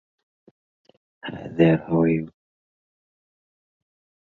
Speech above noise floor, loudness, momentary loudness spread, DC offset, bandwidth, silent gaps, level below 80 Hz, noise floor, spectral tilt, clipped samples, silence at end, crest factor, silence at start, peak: over 69 dB; -21 LUFS; 19 LU; under 0.1%; 4.2 kHz; none; -56 dBFS; under -90 dBFS; -10 dB/octave; under 0.1%; 2 s; 24 dB; 1.25 s; -4 dBFS